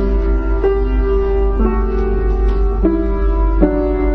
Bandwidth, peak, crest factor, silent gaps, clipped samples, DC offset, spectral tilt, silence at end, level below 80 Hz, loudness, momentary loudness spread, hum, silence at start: 3.8 kHz; 0 dBFS; 14 dB; none; under 0.1%; under 0.1%; -10.5 dB/octave; 0 s; -16 dBFS; -17 LUFS; 3 LU; none; 0 s